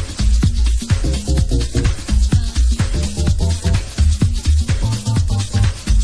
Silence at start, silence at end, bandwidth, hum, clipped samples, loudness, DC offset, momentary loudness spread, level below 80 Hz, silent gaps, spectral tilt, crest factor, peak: 0 s; 0 s; 11 kHz; none; under 0.1%; -18 LUFS; under 0.1%; 3 LU; -18 dBFS; none; -5.5 dB/octave; 12 dB; -4 dBFS